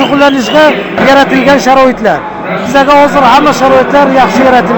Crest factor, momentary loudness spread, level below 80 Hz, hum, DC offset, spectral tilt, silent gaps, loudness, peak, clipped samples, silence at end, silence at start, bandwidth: 6 dB; 6 LU; -34 dBFS; none; under 0.1%; -4.5 dB/octave; none; -6 LUFS; 0 dBFS; 3%; 0 s; 0 s; over 20 kHz